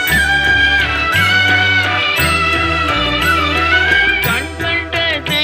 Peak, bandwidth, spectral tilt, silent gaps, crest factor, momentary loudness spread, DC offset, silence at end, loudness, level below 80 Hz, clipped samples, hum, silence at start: -2 dBFS; 16 kHz; -3.5 dB/octave; none; 12 dB; 5 LU; under 0.1%; 0 s; -12 LUFS; -30 dBFS; under 0.1%; none; 0 s